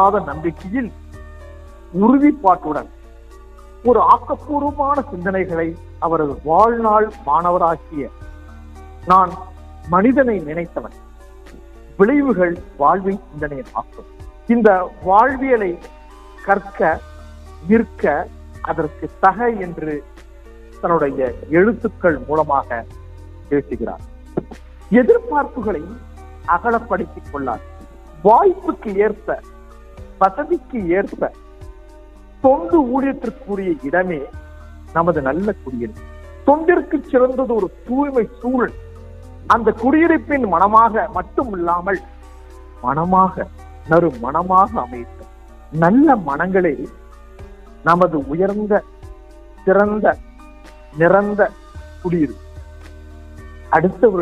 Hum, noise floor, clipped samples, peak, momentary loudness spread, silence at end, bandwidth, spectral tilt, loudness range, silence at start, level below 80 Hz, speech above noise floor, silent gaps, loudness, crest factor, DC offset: none; -40 dBFS; under 0.1%; 0 dBFS; 17 LU; 0 s; 11 kHz; -8.5 dB/octave; 4 LU; 0 s; -38 dBFS; 24 dB; none; -17 LUFS; 18 dB; under 0.1%